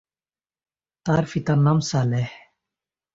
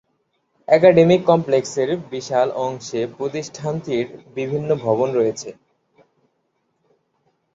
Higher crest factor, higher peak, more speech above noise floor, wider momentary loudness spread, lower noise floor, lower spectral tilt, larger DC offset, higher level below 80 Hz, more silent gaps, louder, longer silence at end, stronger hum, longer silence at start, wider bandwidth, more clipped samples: about the same, 18 dB vs 18 dB; second, -6 dBFS vs -2 dBFS; first, over 70 dB vs 51 dB; second, 11 LU vs 14 LU; first, under -90 dBFS vs -70 dBFS; about the same, -6.5 dB/octave vs -6 dB/octave; neither; first, -54 dBFS vs -60 dBFS; neither; second, -22 LUFS vs -19 LUFS; second, 0.8 s vs 2 s; neither; first, 1.05 s vs 0.7 s; about the same, 7.8 kHz vs 7.8 kHz; neither